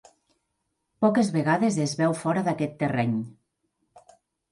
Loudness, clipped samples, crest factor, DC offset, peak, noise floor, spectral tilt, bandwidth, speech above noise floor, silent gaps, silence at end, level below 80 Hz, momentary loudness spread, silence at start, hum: -25 LUFS; under 0.1%; 16 dB; under 0.1%; -10 dBFS; -78 dBFS; -6 dB/octave; 11.5 kHz; 54 dB; none; 0.55 s; -66 dBFS; 5 LU; 1 s; none